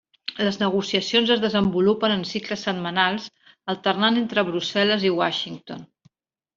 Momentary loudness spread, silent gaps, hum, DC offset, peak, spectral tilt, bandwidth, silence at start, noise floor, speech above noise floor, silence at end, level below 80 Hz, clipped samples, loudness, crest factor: 13 LU; none; none; under 0.1%; -4 dBFS; -5 dB/octave; 7.6 kHz; 0.3 s; -62 dBFS; 40 dB; 0.7 s; -60 dBFS; under 0.1%; -22 LUFS; 18 dB